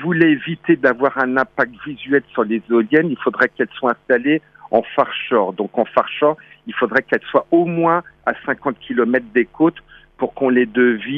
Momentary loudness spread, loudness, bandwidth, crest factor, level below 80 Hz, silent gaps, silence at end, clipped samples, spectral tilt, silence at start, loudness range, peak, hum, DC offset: 7 LU; -18 LUFS; 5.6 kHz; 16 dB; -58 dBFS; none; 0 s; under 0.1%; -8.5 dB/octave; 0 s; 1 LU; 0 dBFS; none; under 0.1%